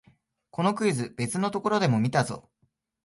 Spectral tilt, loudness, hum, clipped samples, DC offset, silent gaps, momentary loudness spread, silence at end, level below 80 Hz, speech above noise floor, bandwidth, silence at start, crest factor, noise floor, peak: -5.5 dB/octave; -26 LUFS; none; under 0.1%; under 0.1%; none; 9 LU; 0.65 s; -64 dBFS; 47 dB; 11.5 kHz; 0.55 s; 20 dB; -72 dBFS; -8 dBFS